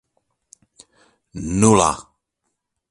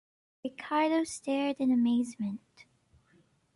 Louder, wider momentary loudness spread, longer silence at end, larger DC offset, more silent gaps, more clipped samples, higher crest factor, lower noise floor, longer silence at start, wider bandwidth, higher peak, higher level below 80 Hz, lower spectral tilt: first, -17 LUFS vs -30 LUFS; first, 19 LU vs 15 LU; second, 0.9 s vs 1.2 s; neither; neither; neither; first, 22 dB vs 16 dB; first, -76 dBFS vs -67 dBFS; first, 1.35 s vs 0.45 s; about the same, 11.5 kHz vs 11.5 kHz; first, 0 dBFS vs -16 dBFS; first, -44 dBFS vs -74 dBFS; about the same, -5 dB/octave vs -5 dB/octave